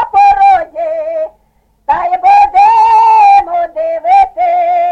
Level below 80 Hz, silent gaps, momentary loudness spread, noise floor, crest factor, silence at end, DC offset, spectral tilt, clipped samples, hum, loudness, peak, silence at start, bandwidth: -42 dBFS; none; 11 LU; -54 dBFS; 8 dB; 0 s; under 0.1%; -3.5 dB/octave; under 0.1%; none; -8 LUFS; 0 dBFS; 0 s; 7.8 kHz